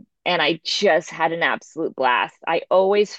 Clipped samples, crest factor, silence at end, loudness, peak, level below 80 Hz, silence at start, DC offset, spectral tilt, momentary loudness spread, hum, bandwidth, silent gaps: under 0.1%; 16 dB; 0 s; -20 LUFS; -4 dBFS; -74 dBFS; 0.25 s; under 0.1%; -3.5 dB/octave; 6 LU; none; 8.4 kHz; none